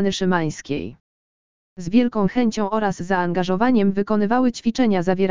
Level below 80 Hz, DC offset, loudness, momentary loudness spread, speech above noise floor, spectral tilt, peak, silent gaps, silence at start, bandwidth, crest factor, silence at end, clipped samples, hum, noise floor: -50 dBFS; 2%; -20 LUFS; 9 LU; over 70 dB; -6.5 dB/octave; -4 dBFS; 1.00-1.76 s; 0 s; 7.6 kHz; 16 dB; 0 s; under 0.1%; none; under -90 dBFS